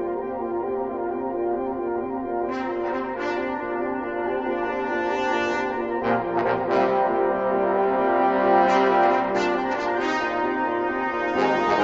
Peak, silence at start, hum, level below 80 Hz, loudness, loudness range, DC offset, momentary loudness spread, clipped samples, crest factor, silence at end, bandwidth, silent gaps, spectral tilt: -6 dBFS; 0 s; none; -54 dBFS; -23 LUFS; 6 LU; under 0.1%; 8 LU; under 0.1%; 16 dB; 0 s; 7.8 kHz; none; -6 dB/octave